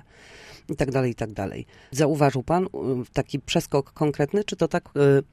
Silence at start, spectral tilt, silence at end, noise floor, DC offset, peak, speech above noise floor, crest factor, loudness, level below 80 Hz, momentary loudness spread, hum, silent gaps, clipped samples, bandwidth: 0.35 s; -6 dB/octave; 0.1 s; -48 dBFS; under 0.1%; -6 dBFS; 24 dB; 18 dB; -25 LUFS; -50 dBFS; 13 LU; none; none; under 0.1%; 14.5 kHz